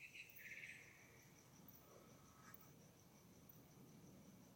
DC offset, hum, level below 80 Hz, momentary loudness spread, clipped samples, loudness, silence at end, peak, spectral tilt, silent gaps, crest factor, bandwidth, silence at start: under 0.1%; none; -84 dBFS; 11 LU; under 0.1%; -62 LUFS; 0 s; -44 dBFS; -3.5 dB/octave; none; 20 dB; 16.5 kHz; 0 s